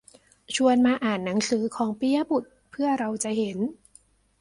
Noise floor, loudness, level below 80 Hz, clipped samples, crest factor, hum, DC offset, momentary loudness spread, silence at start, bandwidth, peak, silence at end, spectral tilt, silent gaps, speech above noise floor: -59 dBFS; -25 LUFS; -64 dBFS; under 0.1%; 16 dB; none; under 0.1%; 9 LU; 0.5 s; 11.5 kHz; -10 dBFS; 0.65 s; -4.5 dB/octave; none; 34 dB